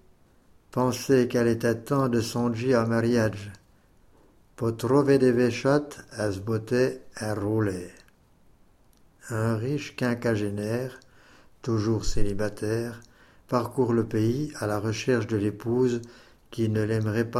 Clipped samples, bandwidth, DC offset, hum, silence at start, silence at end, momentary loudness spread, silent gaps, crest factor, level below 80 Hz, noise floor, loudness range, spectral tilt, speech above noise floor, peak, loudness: under 0.1%; 15 kHz; under 0.1%; none; 0.75 s; 0 s; 10 LU; none; 18 dB; -42 dBFS; -58 dBFS; 6 LU; -6.5 dB/octave; 33 dB; -8 dBFS; -26 LUFS